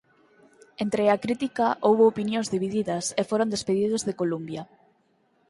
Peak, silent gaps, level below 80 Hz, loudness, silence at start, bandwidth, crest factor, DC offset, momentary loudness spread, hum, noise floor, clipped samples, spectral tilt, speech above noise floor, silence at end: -8 dBFS; none; -64 dBFS; -25 LUFS; 0.8 s; 11.5 kHz; 18 dB; under 0.1%; 8 LU; none; -67 dBFS; under 0.1%; -5 dB/octave; 42 dB; 0.85 s